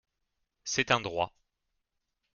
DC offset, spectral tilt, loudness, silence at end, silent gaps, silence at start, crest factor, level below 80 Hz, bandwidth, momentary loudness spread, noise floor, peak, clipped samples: under 0.1%; -2.5 dB/octave; -30 LUFS; 1.05 s; none; 0.65 s; 28 dB; -64 dBFS; 10.5 kHz; 10 LU; -83 dBFS; -8 dBFS; under 0.1%